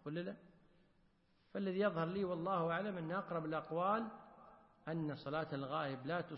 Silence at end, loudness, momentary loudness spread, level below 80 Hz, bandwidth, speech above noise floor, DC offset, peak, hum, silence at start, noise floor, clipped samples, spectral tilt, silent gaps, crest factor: 0 s; -41 LUFS; 12 LU; -76 dBFS; 5.6 kHz; 33 dB; under 0.1%; -24 dBFS; none; 0.05 s; -74 dBFS; under 0.1%; -5.5 dB/octave; none; 18 dB